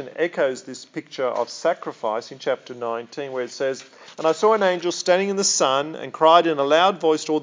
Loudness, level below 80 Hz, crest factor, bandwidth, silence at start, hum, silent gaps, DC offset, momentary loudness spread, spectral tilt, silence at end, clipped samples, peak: -21 LUFS; -88 dBFS; 20 dB; 7.8 kHz; 0 s; none; none; under 0.1%; 13 LU; -3 dB/octave; 0 s; under 0.1%; -2 dBFS